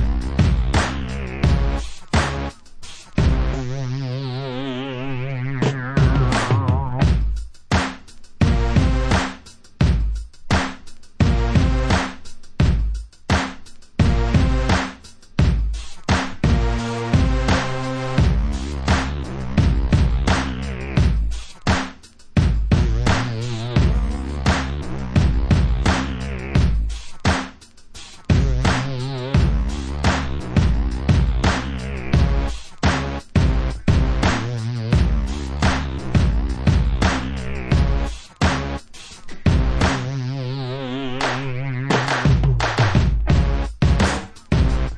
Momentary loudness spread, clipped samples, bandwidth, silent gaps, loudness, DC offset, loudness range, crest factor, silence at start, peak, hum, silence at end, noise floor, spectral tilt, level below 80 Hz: 9 LU; under 0.1%; 10 kHz; none; -21 LUFS; under 0.1%; 2 LU; 16 dB; 0 s; -2 dBFS; none; 0 s; -41 dBFS; -6 dB/octave; -24 dBFS